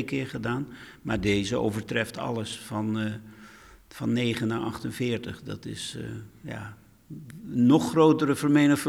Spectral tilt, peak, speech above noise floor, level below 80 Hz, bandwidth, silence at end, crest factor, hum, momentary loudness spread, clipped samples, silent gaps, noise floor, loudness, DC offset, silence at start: -6 dB/octave; -8 dBFS; 24 dB; -56 dBFS; 15.5 kHz; 0 s; 18 dB; none; 20 LU; under 0.1%; none; -50 dBFS; -27 LUFS; under 0.1%; 0 s